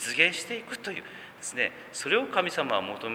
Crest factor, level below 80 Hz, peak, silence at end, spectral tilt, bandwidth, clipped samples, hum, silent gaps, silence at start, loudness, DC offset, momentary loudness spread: 24 dB; -74 dBFS; -6 dBFS; 0 s; -2 dB/octave; over 20 kHz; under 0.1%; none; none; 0 s; -28 LUFS; under 0.1%; 14 LU